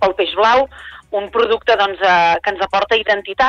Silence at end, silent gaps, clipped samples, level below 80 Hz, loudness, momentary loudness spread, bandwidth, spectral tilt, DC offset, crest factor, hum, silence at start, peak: 0 s; none; under 0.1%; -48 dBFS; -15 LUFS; 11 LU; 8.6 kHz; -3.5 dB/octave; under 0.1%; 14 dB; none; 0 s; -2 dBFS